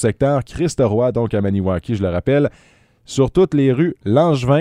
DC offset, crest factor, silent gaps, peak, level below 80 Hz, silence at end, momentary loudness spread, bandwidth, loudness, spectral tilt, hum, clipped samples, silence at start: under 0.1%; 16 dB; none; 0 dBFS; -42 dBFS; 0 s; 6 LU; 11 kHz; -17 LUFS; -7.5 dB/octave; none; under 0.1%; 0 s